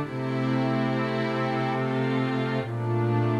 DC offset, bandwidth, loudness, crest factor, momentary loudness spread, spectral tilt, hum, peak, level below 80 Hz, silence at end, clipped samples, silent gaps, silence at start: under 0.1%; 9 kHz; -27 LUFS; 12 dB; 3 LU; -8 dB/octave; none; -14 dBFS; -68 dBFS; 0 s; under 0.1%; none; 0 s